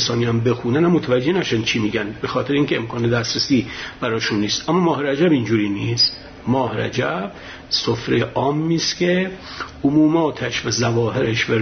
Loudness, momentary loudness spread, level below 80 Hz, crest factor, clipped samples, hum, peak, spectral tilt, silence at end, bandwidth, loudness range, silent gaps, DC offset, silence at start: -19 LUFS; 7 LU; -48 dBFS; 14 dB; under 0.1%; none; -4 dBFS; -5 dB/octave; 0 s; 6.6 kHz; 1 LU; none; under 0.1%; 0 s